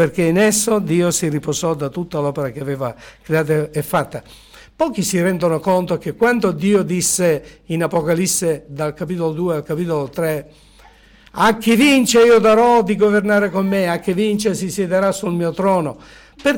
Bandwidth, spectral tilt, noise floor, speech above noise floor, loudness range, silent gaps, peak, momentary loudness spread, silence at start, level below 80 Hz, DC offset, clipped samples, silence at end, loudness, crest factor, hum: 18 kHz; -4.5 dB/octave; -47 dBFS; 30 dB; 7 LU; none; -6 dBFS; 12 LU; 0 s; -48 dBFS; under 0.1%; under 0.1%; 0 s; -17 LUFS; 12 dB; none